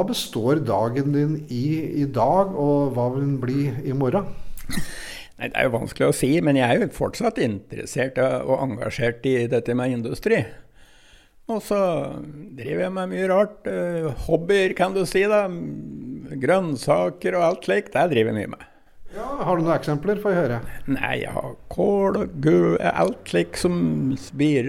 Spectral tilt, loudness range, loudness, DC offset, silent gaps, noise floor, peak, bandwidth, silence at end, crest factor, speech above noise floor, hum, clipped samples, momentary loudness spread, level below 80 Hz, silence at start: -6.5 dB/octave; 3 LU; -22 LUFS; under 0.1%; none; -51 dBFS; -4 dBFS; 16 kHz; 0 s; 18 dB; 29 dB; none; under 0.1%; 13 LU; -44 dBFS; 0 s